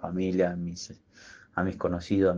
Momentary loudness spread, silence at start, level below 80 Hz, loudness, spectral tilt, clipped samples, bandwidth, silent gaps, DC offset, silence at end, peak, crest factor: 23 LU; 0 s; -56 dBFS; -30 LUFS; -6.5 dB/octave; under 0.1%; 7.6 kHz; none; under 0.1%; 0 s; -12 dBFS; 16 dB